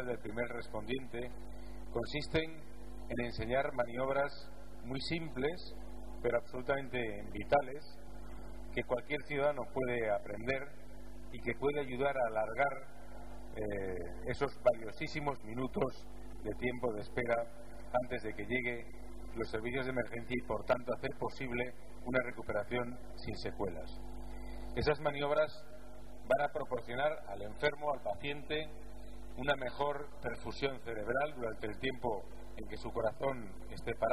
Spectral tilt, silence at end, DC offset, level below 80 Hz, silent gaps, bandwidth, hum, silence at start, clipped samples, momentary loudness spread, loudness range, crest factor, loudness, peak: -6 dB/octave; 0 s; 0.7%; -52 dBFS; none; 14 kHz; none; 0 s; under 0.1%; 17 LU; 3 LU; 22 dB; -38 LUFS; -16 dBFS